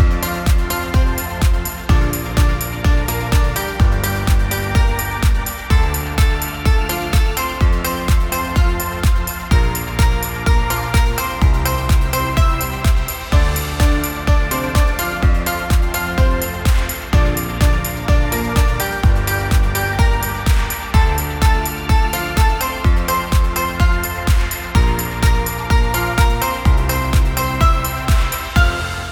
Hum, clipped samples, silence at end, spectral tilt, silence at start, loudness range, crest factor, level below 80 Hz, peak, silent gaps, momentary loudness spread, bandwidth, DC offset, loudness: none; under 0.1%; 0 s; -5 dB/octave; 0 s; 1 LU; 14 dB; -18 dBFS; 0 dBFS; none; 3 LU; 18 kHz; under 0.1%; -17 LUFS